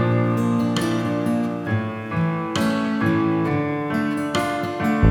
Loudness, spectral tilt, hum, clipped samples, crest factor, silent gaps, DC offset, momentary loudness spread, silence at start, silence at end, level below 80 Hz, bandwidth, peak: -22 LUFS; -6.5 dB/octave; none; under 0.1%; 16 dB; none; under 0.1%; 4 LU; 0 s; 0 s; -46 dBFS; 17.5 kHz; -4 dBFS